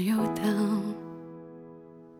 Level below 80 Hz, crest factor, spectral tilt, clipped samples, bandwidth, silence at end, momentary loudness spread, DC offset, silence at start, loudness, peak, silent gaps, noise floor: -66 dBFS; 14 dB; -6.5 dB/octave; under 0.1%; 16.5 kHz; 0 s; 21 LU; under 0.1%; 0 s; -29 LUFS; -16 dBFS; none; -49 dBFS